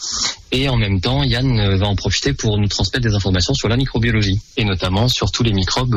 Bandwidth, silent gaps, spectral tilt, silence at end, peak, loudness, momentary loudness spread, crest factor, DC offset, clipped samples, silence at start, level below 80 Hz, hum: 13 kHz; none; -4.5 dB/octave; 0 s; -6 dBFS; -17 LUFS; 3 LU; 10 dB; under 0.1%; under 0.1%; 0 s; -28 dBFS; none